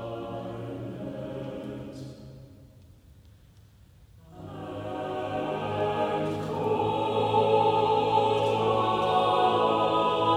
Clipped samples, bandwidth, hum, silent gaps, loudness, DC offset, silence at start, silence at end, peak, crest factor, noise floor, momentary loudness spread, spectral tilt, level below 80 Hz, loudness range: under 0.1%; 13.5 kHz; none; none; -27 LUFS; under 0.1%; 0 s; 0 s; -10 dBFS; 16 dB; -55 dBFS; 16 LU; -6.5 dB/octave; -58 dBFS; 19 LU